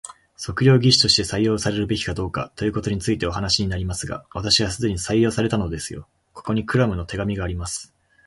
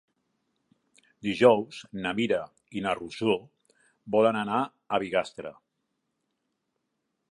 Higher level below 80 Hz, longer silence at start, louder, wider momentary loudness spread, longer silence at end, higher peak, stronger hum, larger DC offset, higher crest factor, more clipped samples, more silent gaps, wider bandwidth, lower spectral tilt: first, -40 dBFS vs -68 dBFS; second, 0.05 s vs 1.25 s; first, -21 LUFS vs -27 LUFS; second, 14 LU vs 17 LU; second, 0.4 s vs 1.8 s; first, -2 dBFS vs -6 dBFS; neither; neither; about the same, 20 dB vs 24 dB; neither; neither; about the same, 11.5 kHz vs 11 kHz; second, -4.5 dB/octave vs -6 dB/octave